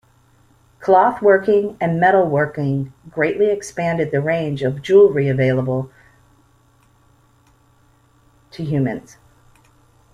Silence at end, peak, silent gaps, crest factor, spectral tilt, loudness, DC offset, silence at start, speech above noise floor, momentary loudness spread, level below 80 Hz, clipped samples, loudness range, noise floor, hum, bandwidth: 1.15 s; -2 dBFS; none; 18 dB; -7.5 dB/octave; -17 LUFS; under 0.1%; 0.8 s; 38 dB; 12 LU; -54 dBFS; under 0.1%; 13 LU; -55 dBFS; none; 11 kHz